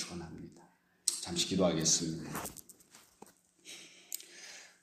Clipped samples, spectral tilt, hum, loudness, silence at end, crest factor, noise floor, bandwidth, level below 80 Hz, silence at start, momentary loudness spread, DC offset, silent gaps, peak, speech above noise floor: under 0.1%; -3 dB/octave; none; -34 LUFS; 0.15 s; 28 dB; -64 dBFS; 15.5 kHz; -66 dBFS; 0 s; 21 LU; under 0.1%; none; -10 dBFS; 31 dB